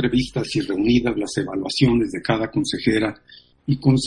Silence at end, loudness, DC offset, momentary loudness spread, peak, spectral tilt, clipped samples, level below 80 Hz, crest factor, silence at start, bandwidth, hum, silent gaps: 0 s; -21 LUFS; under 0.1%; 6 LU; -2 dBFS; -6 dB/octave; under 0.1%; -42 dBFS; 18 dB; 0 s; 11.5 kHz; none; none